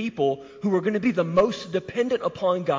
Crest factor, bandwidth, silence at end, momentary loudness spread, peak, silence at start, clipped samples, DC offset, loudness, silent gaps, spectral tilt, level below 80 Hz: 14 dB; 7.6 kHz; 0 s; 6 LU; -10 dBFS; 0 s; under 0.1%; under 0.1%; -24 LUFS; none; -6.5 dB/octave; -60 dBFS